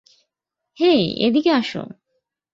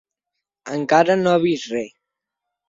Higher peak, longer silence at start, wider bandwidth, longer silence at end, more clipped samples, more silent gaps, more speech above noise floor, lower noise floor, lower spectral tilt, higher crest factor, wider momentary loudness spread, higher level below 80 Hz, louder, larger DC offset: about the same, -4 dBFS vs -2 dBFS; first, 0.8 s vs 0.65 s; about the same, 7.6 kHz vs 7.8 kHz; second, 0.65 s vs 0.8 s; neither; neither; about the same, 64 dB vs 64 dB; about the same, -82 dBFS vs -82 dBFS; about the same, -6.5 dB/octave vs -5.5 dB/octave; about the same, 16 dB vs 20 dB; about the same, 14 LU vs 13 LU; about the same, -60 dBFS vs -64 dBFS; about the same, -18 LUFS vs -19 LUFS; neither